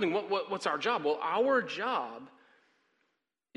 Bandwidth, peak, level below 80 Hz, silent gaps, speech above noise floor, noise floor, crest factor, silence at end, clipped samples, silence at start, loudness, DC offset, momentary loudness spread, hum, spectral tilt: 11.5 kHz; -14 dBFS; -82 dBFS; none; 51 dB; -82 dBFS; 18 dB; 1.3 s; under 0.1%; 0 s; -31 LUFS; under 0.1%; 7 LU; none; -4.5 dB/octave